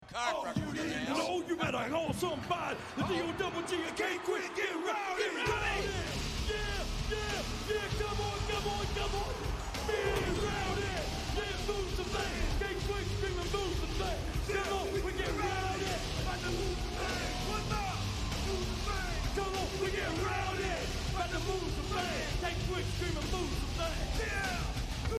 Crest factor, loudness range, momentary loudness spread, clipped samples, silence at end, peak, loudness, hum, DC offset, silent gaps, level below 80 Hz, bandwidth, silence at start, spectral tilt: 16 dB; 1 LU; 3 LU; under 0.1%; 0 s; -18 dBFS; -35 LUFS; none; under 0.1%; none; -40 dBFS; 15 kHz; 0 s; -4.5 dB/octave